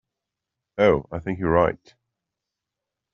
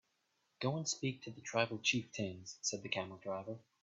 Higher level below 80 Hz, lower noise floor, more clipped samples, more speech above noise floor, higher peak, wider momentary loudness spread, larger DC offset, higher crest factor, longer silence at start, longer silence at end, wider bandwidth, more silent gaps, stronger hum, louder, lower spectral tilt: first, -48 dBFS vs -80 dBFS; first, -85 dBFS vs -81 dBFS; neither; first, 64 dB vs 41 dB; first, -4 dBFS vs -18 dBFS; first, 15 LU vs 9 LU; neither; about the same, 22 dB vs 22 dB; first, 0.75 s vs 0.6 s; first, 1.4 s vs 0.2 s; second, 6.6 kHz vs 8.2 kHz; neither; neither; first, -22 LUFS vs -39 LUFS; first, -6 dB/octave vs -3.5 dB/octave